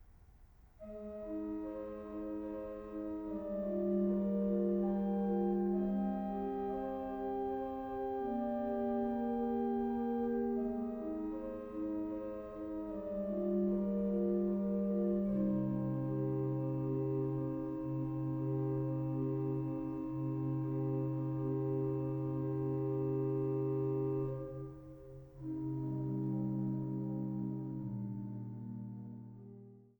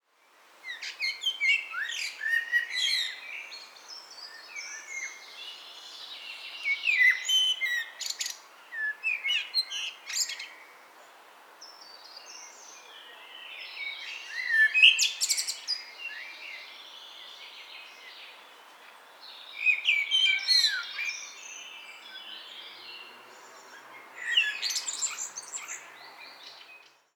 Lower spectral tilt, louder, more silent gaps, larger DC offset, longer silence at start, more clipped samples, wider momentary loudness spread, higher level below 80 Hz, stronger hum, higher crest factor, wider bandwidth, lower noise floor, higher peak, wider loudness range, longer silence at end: first, -11.5 dB/octave vs 5 dB/octave; second, -38 LUFS vs -26 LUFS; neither; neither; second, 0 s vs 0.65 s; neither; second, 10 LU vs 24 LU; first, -60 dBFS vs under -90 dBFS; neither; second, 14 dB vs 28 dB; about the same, over 20 kHz vs over 20 kHz; about the same, -61 dBFS vs -62 dBFS; second, -24 dBFS vs -4 dBFS; second, 5 LU vs 16 LU; second, 0.2 s vs 0.35 s